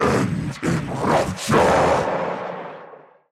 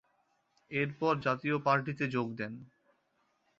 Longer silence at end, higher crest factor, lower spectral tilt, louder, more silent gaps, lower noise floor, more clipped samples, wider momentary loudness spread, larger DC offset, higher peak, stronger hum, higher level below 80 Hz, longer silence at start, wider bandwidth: second, 0.35 s vs 0.95 s; second, 12 dB vs 22 dB; about the same, -5.5 dB/octave vs -5 dB/octave; first, -20 LUFS vs -33 LUFS; neither; second, -44 dBFS vs -76 dBFS; neither; first, 16 LU vs 11 LU; neither; first, -8 dBFS vs -14 dBFS; neither; first, -44 dBFS vs -72 dBFS; second, 0 s vs 0.7 s; first, 15.5 kHz vs 7.6 kHz